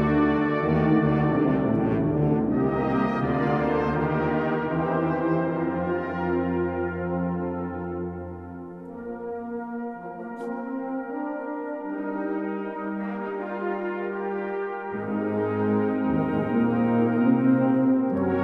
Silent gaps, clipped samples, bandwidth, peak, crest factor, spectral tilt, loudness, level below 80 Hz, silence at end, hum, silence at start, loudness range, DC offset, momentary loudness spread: none; under 0.1%; 5.6 kHz; -10 dBFS; 16 dB; -10 dB/octave; -25 LUFS; -48 dBFS; 0 s; none; 0 s; 10 LU; under 0.1%; 12 LU